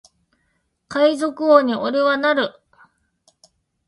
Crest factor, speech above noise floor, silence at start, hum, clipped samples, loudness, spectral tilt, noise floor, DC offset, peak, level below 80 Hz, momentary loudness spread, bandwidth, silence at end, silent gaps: 20 dB; 52 dB; 0.9 s; none; under 0.1%; -18 LUFS; -4.5 dB/octave; -69 dBFS; under 0.1%; 0 dBFS; -68 dBFS; 8 LU; 11.5 kHz; 1.4 s; none